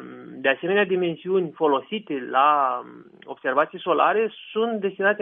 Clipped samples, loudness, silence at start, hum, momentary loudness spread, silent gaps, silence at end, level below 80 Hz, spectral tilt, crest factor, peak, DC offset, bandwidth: under 0.1%; -23 LUFS; 0 s; none; 10 LU; none; 0 s; -76 dBFS; -8 dB/octave; 16 dB; -6 dBFS; under 0.1%; 3.8 kHz